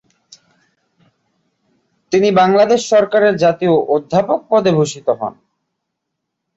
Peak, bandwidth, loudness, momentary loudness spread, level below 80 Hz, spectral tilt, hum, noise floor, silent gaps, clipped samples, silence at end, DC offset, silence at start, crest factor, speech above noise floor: -2 dBFS; 8 kHz; -14 LUFS; 8 LU; -58 dBFS; -5.5 dB/octave; none; -76 dBFS; none; under 0.1%; 1.25 s; under 0.1%; 2.1 s; 14 dB; 63 dB